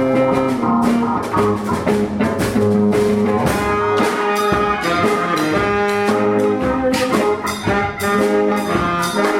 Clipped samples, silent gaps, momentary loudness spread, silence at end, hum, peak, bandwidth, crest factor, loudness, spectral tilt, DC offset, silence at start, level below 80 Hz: under 0.1%; none; 3 LU; 0 s; none; -2 dBFS; 16.5 kHz; 14 dB; -17 LUFS; -5.5 dB/octave; under 0.1%; 0 s; -40 dBFS